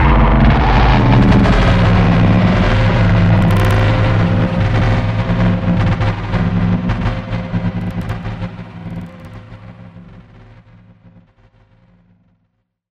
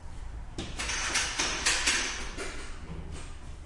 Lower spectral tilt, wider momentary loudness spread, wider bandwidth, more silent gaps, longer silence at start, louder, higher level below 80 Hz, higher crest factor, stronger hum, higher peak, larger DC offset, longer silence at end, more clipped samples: first, -8 dB/octave vs -1 dB/octave; about the same, 16 LU vs 18 LU; second, 7.8 kHz vs 11.5 kHz; neither; about the same, 0 s vs 0 s; first, -14 LUFS vs -29 LUFS; first, -20 dBFS vs -42 dBFS; second, 12 dB vs 20 dB; neither; first, 0 dBFS vs -12 dBFS; neither; first, 2.95 s vs 0 s; neither